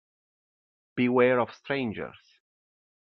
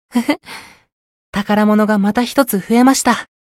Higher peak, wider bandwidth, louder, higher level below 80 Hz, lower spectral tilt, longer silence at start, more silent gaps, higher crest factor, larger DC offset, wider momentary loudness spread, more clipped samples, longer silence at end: second, -10 dBFS vs 0 dBFS; second, 6.2 kHz vs 16.5 kHz; second, -26 LUFS vs -14 LUFS; second, -72 dBFS vs -50 dBFS; about the same, -4.5 dB/octave vs -4.5 dB/octave; first, 0.95 s vs 0.15 s; second, none vs 0.92-1.33 s; first, 20 dB vs 14 dB; neither; first, 16 LU vs 12 LU; neither; first, 0.95 s vs 0.15 s